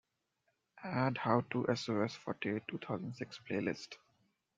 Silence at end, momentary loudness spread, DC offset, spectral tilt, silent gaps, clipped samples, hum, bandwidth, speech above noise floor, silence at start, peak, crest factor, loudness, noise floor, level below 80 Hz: 0.6 s; 13 LU; under 0.1%; -6.5 dB/octave; none; under 0.1%; none; 7.8 kHz; 45 dB; 0.75 s; -16 dBFS; 24 dB; -38 LUFS; -82 dBFS; -76 dBFS